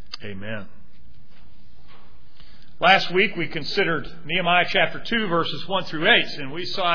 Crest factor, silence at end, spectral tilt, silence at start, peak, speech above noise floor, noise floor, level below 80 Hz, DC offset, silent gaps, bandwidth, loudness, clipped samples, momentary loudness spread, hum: 22 dB; 0 s; -5 dB/octave; 0.1 s; -4 dBFS; 30 dB; -52 dBFS; -52 dBFS; 4%; none; 5.4 kHz; -21 LUFS; under 0.1%; 16 LU; none